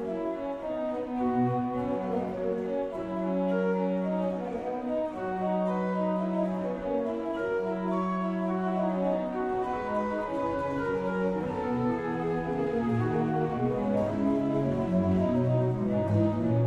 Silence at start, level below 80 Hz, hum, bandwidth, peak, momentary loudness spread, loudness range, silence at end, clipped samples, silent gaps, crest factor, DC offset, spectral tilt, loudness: 0 s; -54 dBFS; none; 8.2 kHz; -14 dBFS; 6 LU; 3 LU; 0 s; under 0.1%; none; 14 dB; under 0.1%; -9.5 dB/octave; -29 LUFS